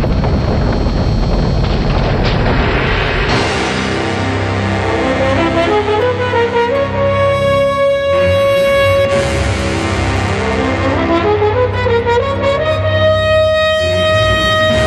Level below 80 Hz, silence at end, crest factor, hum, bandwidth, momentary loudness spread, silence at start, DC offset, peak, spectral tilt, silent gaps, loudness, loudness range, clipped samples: -22 dBFS; 0 s; 12 dB; none; 13 kHz; 4 LU; 0 s; under 0.1%; -2 dBFS; -6 dB/octave; none; -13 LUFS; 2 LU; under 0.1%